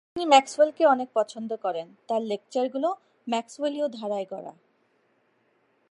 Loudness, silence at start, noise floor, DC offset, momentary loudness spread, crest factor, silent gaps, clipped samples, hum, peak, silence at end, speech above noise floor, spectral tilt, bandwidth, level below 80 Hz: -26 LUFS; 0.15 s; -68 dBFS; under 0.1%; 15 LU; 24 dB; none; under 0.1%; none; -4 dBFS; 1.4 s; 43 dB; -3.5 dB/octave; 11 kHz; -76 dBFS